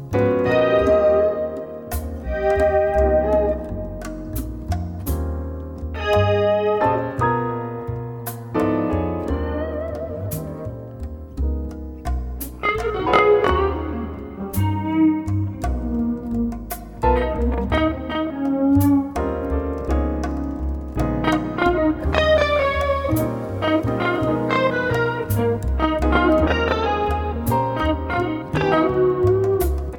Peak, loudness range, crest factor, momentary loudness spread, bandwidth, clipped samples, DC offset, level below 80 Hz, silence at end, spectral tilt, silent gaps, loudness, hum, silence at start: -2 dBFS; 5 LU; 20 dB; 12 LU; 19.5 kHz; under 0.1%; under 0.1%; -30 dBFS; 0 s; -7 dB/octave; none; -21 LUFS; none; 0 s